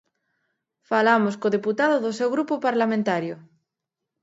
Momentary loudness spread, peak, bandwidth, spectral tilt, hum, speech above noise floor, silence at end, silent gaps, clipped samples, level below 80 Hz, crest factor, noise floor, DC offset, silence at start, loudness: 7 LU; -4 dBFS; 8 kHz; -6 dB/octave; none; 62 dB; 0.8 s; none; under 0.1%; -74 dBFS; 20 dB; -84 dBFS; under 0.1%; 0.9 s; -22 LUFS